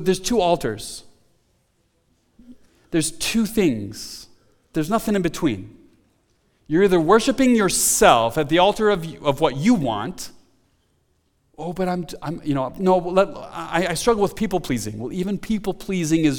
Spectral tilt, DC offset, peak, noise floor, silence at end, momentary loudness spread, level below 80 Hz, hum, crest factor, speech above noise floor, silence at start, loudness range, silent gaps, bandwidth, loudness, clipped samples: -4.5 dB/octave; under 0.1%; 0 dBFS; -65 dBFS; 0 s; 15 LU; -44 dBFS; none; 22 dB; 45 dB; 0 s; 8 LU; none; 19 kHz; -20 LUFS; under 0.1%